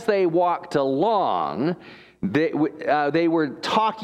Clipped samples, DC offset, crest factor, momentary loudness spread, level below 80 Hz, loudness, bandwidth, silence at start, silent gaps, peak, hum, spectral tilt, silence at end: under 0.1%; under 0.1%; 16 dB; 6 LU; -64 dBFS; -22 LUFS; 11 kHz; 0 s; none; -6 dBFS; none; -6.5 dB/octave; 0 s